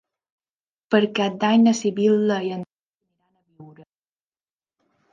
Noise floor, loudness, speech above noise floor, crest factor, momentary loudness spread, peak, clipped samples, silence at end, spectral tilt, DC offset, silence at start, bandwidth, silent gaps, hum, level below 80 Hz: under -90 dBFS; -20 LUFS; over 70 dB; 20 dB; 13 LU; -4 dBFS; under 0.1%; 1.45 s; -5.5 dB/octave; under 0.1%; 0.9 s; 7.6 kHz; 2.73-2.78 s, 2.88-2.93 s; none; -74 dBFS